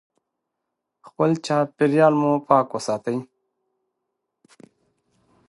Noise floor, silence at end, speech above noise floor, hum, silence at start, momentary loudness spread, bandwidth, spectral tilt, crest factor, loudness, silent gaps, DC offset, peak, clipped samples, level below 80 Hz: -81 dBFS; 2.25 s; 61 dB; none; 1.2 s; 9 LU; 11.5 kHz; -6.5 dB/octave; 22 dB; -21 LUFS; none; under 0.1%; -2 dBFS; under 0.1%; -72 dBFS